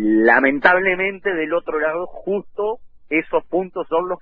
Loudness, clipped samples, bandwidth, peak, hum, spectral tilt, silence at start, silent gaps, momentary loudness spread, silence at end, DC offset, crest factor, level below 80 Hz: -19 LUFS; under 0.1%; 5 kHz; 0 dBFS; none; -8 dB/octave; 0 s; none; 11 LU; 0.05 s; under 0.1%; 18 dB; -52 dBFS